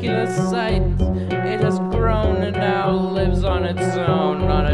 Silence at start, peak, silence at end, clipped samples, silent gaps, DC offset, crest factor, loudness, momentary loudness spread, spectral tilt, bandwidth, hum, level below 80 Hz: 0 s; -4 dBFS; 0 s; under 0.1%; none; under 0.1%; 14 dB; -20 LUFS; 2 LU; -7 dB/octave; 11 kHz; none; -26 dBFS